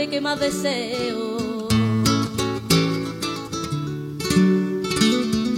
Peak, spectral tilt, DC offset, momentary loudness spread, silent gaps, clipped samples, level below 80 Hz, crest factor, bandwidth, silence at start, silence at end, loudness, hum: -4 dBFS; -5 dB/octave; under 0.1%; 8 LU; none; under 0.1%; -46 dBFS; 18 dB; 16.5 kHz; 0 s; 0 s; -22 LUFS; none